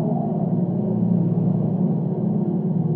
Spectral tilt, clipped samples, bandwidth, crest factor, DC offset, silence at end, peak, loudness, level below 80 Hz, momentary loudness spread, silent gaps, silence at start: -14 dB/octave; under 0.1%; 1.8 kHz; 12 dB; under 0.1%; 0 s; -8 dBFS; -22 LUFS; -60 dBFS; 3 LU; none; 0 s